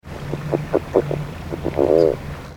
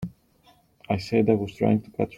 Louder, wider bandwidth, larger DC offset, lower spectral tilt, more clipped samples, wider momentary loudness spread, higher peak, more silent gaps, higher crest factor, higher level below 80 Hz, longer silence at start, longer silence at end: first, -21 LUFS vs -24 LUFS; first, 19 kHz vs 11 kHz; neither; about the same, -8 dB/octave vs -8 dB/octave; neither; first, 13 LU vs 8 LU; first, 0 dBFS vs -6 dBFS; neither; about the same, 20 dB vs 20 dB; first, -38 dBFS vs -56 dBFS; about the same, 0.05 s vs 0 s; about the same, 0 s vs 0 s